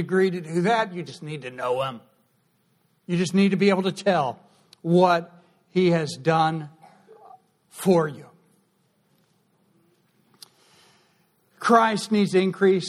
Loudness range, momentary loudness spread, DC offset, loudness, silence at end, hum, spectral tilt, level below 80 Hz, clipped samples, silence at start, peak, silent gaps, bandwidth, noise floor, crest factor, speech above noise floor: 7 LU; 16 LU; under 0.1%; -23 LUFS; 0 s; none; -6 dB/octave; -68 dBFS; under 0.1%; 0 s; -4 dBFS; none; 13.5 kHz; -67 dBFS; 20 dB; 45 dB